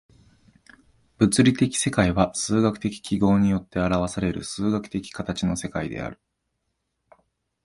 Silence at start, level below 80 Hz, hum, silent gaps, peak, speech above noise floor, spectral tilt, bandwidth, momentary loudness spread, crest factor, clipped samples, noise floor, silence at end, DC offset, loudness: 1.2 s; -46 dBFS; none; none; -4 dBFS; 54 dB; -5.5 dB/octave; 11.5 kHz; 11 LU; 20 dB; under 0.1%; -77 dBFS; 1.5 s; under 0.1%; -23 LUFS